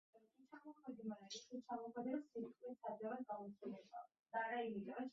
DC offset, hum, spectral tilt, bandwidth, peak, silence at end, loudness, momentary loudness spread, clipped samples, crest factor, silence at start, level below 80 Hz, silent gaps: under 0.1%; none; -3.5 dB/octave; 7.4 kHz; -32 dBFS; 0 s; -50 LUFS; 13 LU; under 0.1%; 18 dB; 0.15 s; under -90 dBFS; 4.19-4.24 s